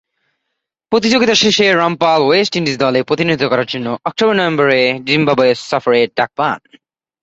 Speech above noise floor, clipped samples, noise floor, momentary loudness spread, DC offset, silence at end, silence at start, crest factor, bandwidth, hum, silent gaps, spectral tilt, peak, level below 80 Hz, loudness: 62 dB; under 0.1%; -75 dBFS; 7 LU; under 0.1%; 0.65 s; 0.9 s; 14 dB; 8 kHz; none; none; -4 dB/octave; 0 dBFS; -54 dBFS; -13 LUFS